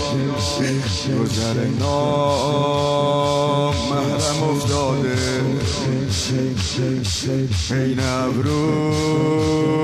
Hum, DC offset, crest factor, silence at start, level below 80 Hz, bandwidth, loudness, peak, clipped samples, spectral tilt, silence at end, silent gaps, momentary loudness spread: none; under 0.1%; 14 dB; 0 s; -42 dBFS; 14 kHz; -20 LUFS; -6 dBFS; under 0.1%; -5.5 dB/octave; 0 s; none; 3 LU